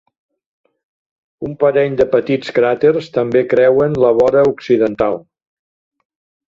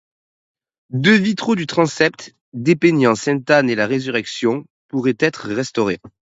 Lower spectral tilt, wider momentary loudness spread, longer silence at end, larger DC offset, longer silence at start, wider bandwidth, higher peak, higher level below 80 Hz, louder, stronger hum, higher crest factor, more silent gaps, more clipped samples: first, -7.5 dB/octave vs -5.5 dB/octave; second, 7 LU vs 12 LU; first, 1.4 s vs 0.3 s; neither; first, 1.4 s vs 0.9 s; about the same, 7.4 kHz vs 8 kHz; about the same, -2 dBFS vs 0 dBFS; first, -50 dBFS vs -60 dBFS; first, -14 LUFS vs -18 LUFS; neither; about the same, 14 dB vs 18 dB; second, none vs 2.41-2.52 s, 4.70-4.89 s; neither